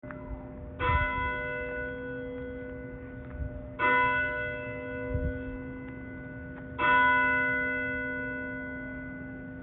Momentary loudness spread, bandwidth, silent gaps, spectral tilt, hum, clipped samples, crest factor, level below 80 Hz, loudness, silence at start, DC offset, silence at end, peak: 17 LU; 4.2 kHz; none; -3.5 dB/octave; none; under 0.1%; 18 dB; -44 dBFS; -30 LUFS; 0.05 s; under 0.1%; 0 s; -12 dBFS